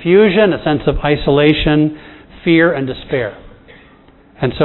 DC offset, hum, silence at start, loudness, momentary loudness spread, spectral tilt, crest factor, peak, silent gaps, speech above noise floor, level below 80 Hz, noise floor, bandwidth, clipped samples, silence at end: under 0.1%; none; 0 s; -14 LUFS; 10 LU; -10 dB/octave; 14 dB; 0 dBFS; none; 32 dB; -32 dBFS; -45 dBFS; 4.2 kHz; under 0.1%; 0 s